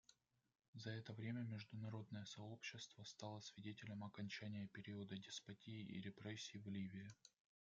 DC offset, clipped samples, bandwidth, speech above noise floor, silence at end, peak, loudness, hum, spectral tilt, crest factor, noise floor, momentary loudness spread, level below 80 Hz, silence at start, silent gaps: under 0.1%; under 0.1%; 7.8 kHz; 25 dB; 0.4 s; -36 dBFS; -53 LUFS; none; -5 dB/octave; 18 dB; -78 dBFS; 6 LU; -88 dBFS; 0.1 s; 0.68-0.73 s